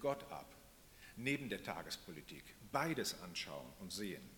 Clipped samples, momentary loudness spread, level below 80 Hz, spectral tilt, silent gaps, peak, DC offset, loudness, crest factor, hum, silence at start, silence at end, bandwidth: under 0.1%; 17 LU; -68 dBFS; -4 dB/octave; none; -22 dBFS; under 0.1%; -44 LUFS; 22 dB; none; 0 s; 0 s; 18 kHz